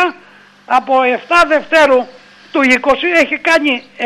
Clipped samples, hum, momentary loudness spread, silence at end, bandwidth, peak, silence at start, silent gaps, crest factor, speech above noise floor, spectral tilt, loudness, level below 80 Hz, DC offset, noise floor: under 0.1%; 50 Hz at -55 dBFS; 7 LU; 0 s; 13 kHz; -2 dBFS; 0 s; none; 10 dB; 31 dB; -2.5 dB/octave; -12 LUFS; -48 dBFS; under 0.1%; -43 dBFS